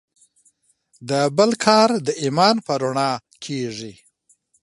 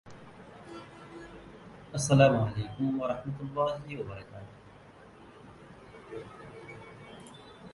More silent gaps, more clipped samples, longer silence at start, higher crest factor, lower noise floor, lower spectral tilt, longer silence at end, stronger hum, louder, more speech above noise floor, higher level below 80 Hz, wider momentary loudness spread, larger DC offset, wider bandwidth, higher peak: neither; neither; first, 1 s vs 0.05 s; about the same, 22 dB vs 24 dB; first, -62 dBFS vs -53 dBFS; second, -4.5 dB/octave vs -6 dB/octave; first, 0.7 s vs 0 s; neither; first, -19 LUFS vs -29 LUFS; first, 43 dB vs 25 dB; second, -66 dBFS vs -58 dBFS; second, 15 LU vs 26 LU; neither; about the same, 11.5 kHz vs 11.5 kHz; first, 0 dBFS vs -10 dBFS